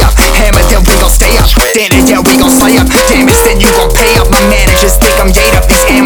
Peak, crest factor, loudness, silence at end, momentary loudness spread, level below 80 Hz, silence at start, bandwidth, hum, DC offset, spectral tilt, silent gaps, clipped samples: 0 dBFS; 6 dB; -6 LUFS; 0 s; 2 LU; -10 dBFS; 0 s; over 20 kHz; none; under 0.1%; -3.5 dB/octave; none; 5%